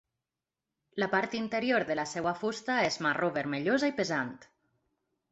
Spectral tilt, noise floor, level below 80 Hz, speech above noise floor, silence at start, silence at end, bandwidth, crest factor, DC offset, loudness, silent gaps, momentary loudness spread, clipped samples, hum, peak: -4.5 dB/octave; -90 dBFS; -70 dBFS; 59 dB; 0.95 s; 0.9 s; 8.2 kHz; 20 dB; under 0.1%; -31 LUFS; none; 5 LU; under 0.1%; none; -12 dBFS